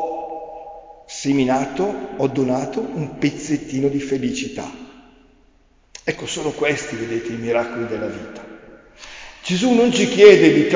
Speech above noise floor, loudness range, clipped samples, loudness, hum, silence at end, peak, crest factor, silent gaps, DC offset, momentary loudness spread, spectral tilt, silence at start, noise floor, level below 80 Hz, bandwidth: 37 dB; 8 LU; under 0.1%; -19 LUFS; none; 0 s; 0 dBFS; 20 dB; none; under 0.1%; 21 LU; -5 dB/octave; 0 s; -55 dBFS; -52 dBFS; 7.6 kHz